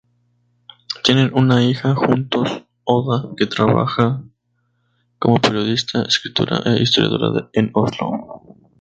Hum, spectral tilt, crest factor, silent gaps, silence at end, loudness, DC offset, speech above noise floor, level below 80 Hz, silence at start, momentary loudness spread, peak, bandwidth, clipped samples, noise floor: 60 Hz at -35 dBFS; -6 dB/octave; 18 dB; none; 0.45 s; -17 LUFS; under 0.1%; 50 dB; -52 dBFS; 0.9 s; 9 LU; 0 dBFS; 8 kHz; under 0.1%; -67 dBFS